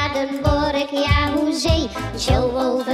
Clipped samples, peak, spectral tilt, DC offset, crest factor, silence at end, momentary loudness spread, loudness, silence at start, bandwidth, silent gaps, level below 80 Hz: under 0.1%; -2 dBFS; -5.5 dB/octave; under 0.1%; 16 dB; 0 s; 4 LU; -20 LUFS; 0 s; 15.5 kHz; none; -28 dBFS